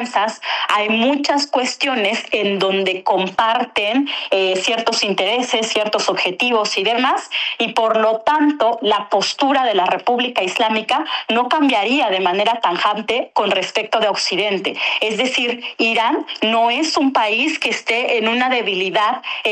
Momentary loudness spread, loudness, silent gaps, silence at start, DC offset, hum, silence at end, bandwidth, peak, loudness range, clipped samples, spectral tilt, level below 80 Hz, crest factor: 3 LU; -17 LUFS; none; 0 s; under 0.1%; none; 0 s; 11.5 kHz; -4 dBFS; 1 LU; under 0.1%; -3 dB/octave; -66 dBFS; 14 dB